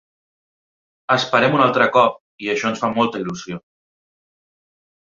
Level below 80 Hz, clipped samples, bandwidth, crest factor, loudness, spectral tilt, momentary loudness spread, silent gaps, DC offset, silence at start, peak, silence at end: -62 dBFS; under 0.1%; 7.6 kHz; 20 dB; -18 LUFS; -5 dB/octave; 16 LU; 2.20-2.38 s; under 0.1%; 1.1 s; -2 dBFS; 1.5 s